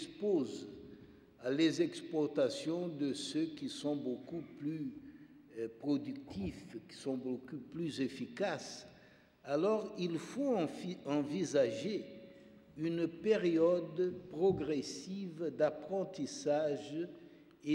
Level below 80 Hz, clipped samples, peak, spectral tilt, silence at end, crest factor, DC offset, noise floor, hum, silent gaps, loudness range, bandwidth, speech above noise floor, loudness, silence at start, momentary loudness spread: -72 dBFS; under 0.1%; -20 dBFS; -5.5 dB/octave; 0 s; 18 dB; under 0.1%; -63 dBFS; none; none; 7 LU; 12 kHz; 27 dB; -37 LUFS; 0 s; 15 LU